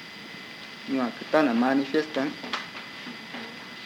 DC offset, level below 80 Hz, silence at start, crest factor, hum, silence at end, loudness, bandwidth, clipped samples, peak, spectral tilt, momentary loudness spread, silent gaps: under 0.1%; -76 dBFS; 0 s; 20 dB; none; 0 s; -28 LUFS; 16.5 kHz; under 0.1%; -8 dBFS; -5 dB/octave; 16 LU; none